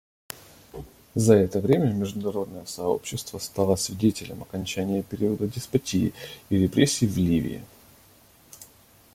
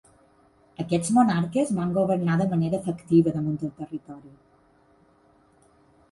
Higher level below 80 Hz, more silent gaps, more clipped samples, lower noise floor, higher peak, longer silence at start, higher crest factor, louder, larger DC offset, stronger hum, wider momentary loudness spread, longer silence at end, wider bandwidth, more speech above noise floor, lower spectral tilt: first, -54 dBFS vs -60 dBFS; neither; neither; second, -55 dBFS vs -60 dBFS; first, -4 dBFS vs -8 dBFS; second, 0.3 s vs 0.8 s; about the same, 22 dB vs 18 dB; about the same, -25 LUFS vs -24 LUFS; neither; neither; first, 20 LU vs 16 LU; second, 0.5 s vs 1.85 s; first, 16.5 kHz vs 11.5 kHz; second, 31 dB vs 36 dB; second, -5.5 dB/octave vs -7 dB/octave